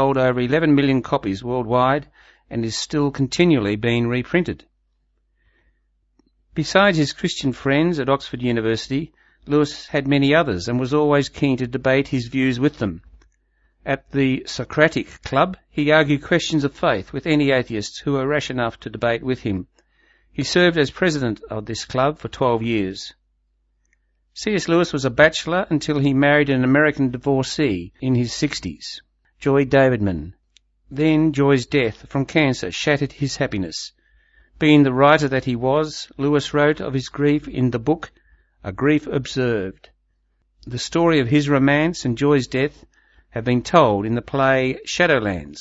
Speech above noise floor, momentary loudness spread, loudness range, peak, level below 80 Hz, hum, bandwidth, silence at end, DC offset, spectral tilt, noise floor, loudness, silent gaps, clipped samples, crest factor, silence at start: 47 dB; 11 LU; 4 LU; 0 dBFS; -48 dBFS; none; 8 kHz; 0 s; under 0.1%; -6 dB/octave; -66 dBFS; -20 LUFS; none; under 0.1%; 20 dB; 0 s